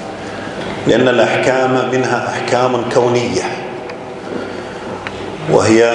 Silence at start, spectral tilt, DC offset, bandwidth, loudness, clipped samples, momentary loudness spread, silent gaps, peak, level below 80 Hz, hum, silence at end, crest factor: 0 s; -5 dB/octave; under 0.1%; 10.5 kHz; -15 LUFS; under 0.1%; 14 LU; none; 0 dBFS; -50 dBFS; none; 0 s; 16 dB